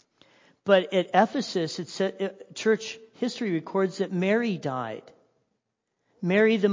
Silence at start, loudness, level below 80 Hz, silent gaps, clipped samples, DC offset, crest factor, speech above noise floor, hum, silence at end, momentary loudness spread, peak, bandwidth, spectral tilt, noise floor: 0.65 s; -26 LUFS; -76 dBFS; none; under 0.1%; under 0.1%; 20 dB; 54 dB; none; 0 s; 12 LU; -6 dBFS; 7.6 kHz; -5.5 dB/octave; -80 dBFS